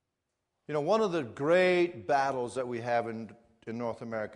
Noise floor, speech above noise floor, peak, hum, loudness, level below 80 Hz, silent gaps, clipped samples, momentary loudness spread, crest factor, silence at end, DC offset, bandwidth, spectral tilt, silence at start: -84 dBFS; 54 dB; -14 dBFS; none; -30 LUFS; -74 dBFS; none; under 0.1%; 15 LU; 18 dB; 0 s; under 0.1%; 11 kHz; -6 dB/octave; 0.7 s